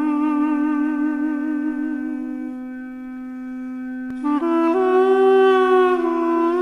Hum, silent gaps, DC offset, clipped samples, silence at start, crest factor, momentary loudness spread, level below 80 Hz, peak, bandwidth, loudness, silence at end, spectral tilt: none; none; under 0.1%; under 0.1%; 0 s; 12 dB; 17 LU; -58 dBFS; -6 dBFS; 6.2 kHz; -19 LUFS; 0 s; -5.5 dB/octave